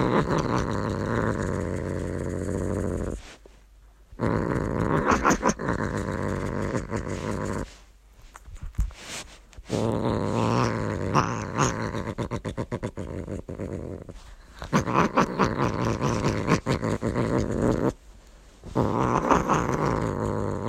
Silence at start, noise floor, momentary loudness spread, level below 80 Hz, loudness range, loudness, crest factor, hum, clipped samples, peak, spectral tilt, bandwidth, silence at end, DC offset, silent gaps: 0 s; -53 dBFS; 13 LU; -40 dBFS; 6 LU; -27 LUFS; 22 dB; none; under 0.1%; -4 dBFS; -6 dB/octave; 14.5 kHz; 0 s; under 0.1%; none